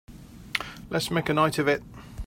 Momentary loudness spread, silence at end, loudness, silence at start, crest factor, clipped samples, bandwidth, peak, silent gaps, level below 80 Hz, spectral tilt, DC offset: 13 LU; 0 s; -27 LUFS; 0.1 s; 24 dB; under 0.1%; 16 kHz; -4 dBFS; none; -48 dBFS; -5 dB/octave; under 0.1%